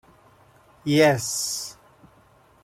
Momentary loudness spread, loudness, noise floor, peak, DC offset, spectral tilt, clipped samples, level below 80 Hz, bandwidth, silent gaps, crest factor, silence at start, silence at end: 15 LU; -22 LUFS; -56 dBFS; -6 dBFS; under 0.1%; -4 dB/octave; under 0.1%; -62 dBFS; 16.5 kHz; none; 20 dB; 0.85 s; 0.9 s